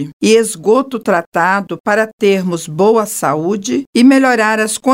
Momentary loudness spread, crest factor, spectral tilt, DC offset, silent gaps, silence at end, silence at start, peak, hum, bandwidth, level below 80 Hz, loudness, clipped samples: 7 LU; 12 dB; -4.5 dB/octave; under 0.1%; 0.13-0.20 s, 1.26-1.32 s, 1.80-1.84 s, 2.13-2.18 s, 3.87-3.93 s; 0 s; 0 s; 0 dBFS; none; 16.5 kHz; -62 dBFS; -13 LUFS; under 0.1%